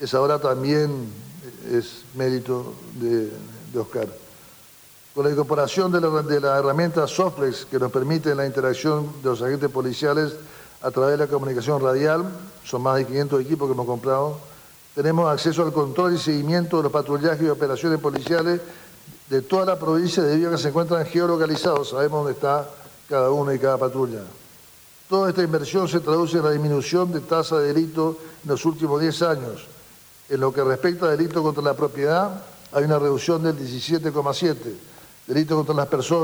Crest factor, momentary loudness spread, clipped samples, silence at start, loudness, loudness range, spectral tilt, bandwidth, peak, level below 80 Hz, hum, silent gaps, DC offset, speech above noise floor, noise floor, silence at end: 16 dB; 10 LU; under 0.1%; 0 s; -22 LUFS; 3 LU; -6 dB/octave; over 20 kHz; -6 dBFS; -64 dBFS; none; none; under 0.1%; 27 dB; -49 dBFS; 0 s